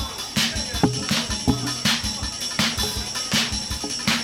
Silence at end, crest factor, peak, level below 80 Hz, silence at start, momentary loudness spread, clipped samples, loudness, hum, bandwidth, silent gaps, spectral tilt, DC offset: 0 s; 18 dB; -6 dBFS; -38 dBFS; 0 s; 5 LU; under 0.1%; -22 LUFS; none; 17.5 kHz; none; -2.5 dB/octave; under 0.1%